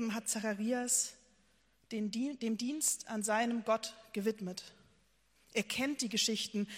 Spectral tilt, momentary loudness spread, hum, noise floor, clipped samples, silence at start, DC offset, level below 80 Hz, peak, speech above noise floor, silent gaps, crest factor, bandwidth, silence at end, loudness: -2.5 dB/octave; 10 LU; none; -72 dBFS; under 0.1%; 0 s; under 0.1%; -76 dBFS; -16 dBFS; 36 dB; none; 20 dB; 16 kHz; 0 s; -35 LUFS